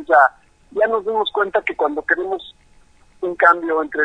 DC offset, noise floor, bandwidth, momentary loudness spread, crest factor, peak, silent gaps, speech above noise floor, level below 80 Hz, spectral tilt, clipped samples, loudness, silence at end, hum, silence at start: under 0.1%; -51 dBFS; 9.4 kHz; 13 LU; 18 dB; 0 dBFS; none; 33 dB; -56 dBFS; -4.5 dB/octave; under 0.1%; -18 LUFS; 0 s; none; 0 s